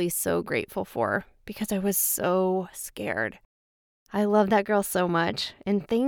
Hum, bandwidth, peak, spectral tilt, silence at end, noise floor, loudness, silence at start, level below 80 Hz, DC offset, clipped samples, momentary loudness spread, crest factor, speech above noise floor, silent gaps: none; over 20 kHz; -8 dBFS; -4 dB/octave; 0 s; under -90 dBFS; -26 LUFS; 0 s; -60 dBFS; under 0.1%; under 0.1%; 10 LU; 18 dB; over 64 dB; 3.45-4.06 s